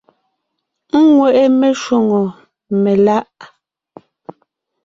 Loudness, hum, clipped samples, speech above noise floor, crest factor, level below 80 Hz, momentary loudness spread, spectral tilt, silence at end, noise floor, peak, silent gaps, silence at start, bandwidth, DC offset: -13 LUFS; none; under 0.1%; 62 dB; 14 dB; -60 dBFS; 9 LU; -7 dB/octave; 1.4 s; -74 dBFS; -2 dBFS; none; 0.95 s; 7.8 kHz; under 0.1%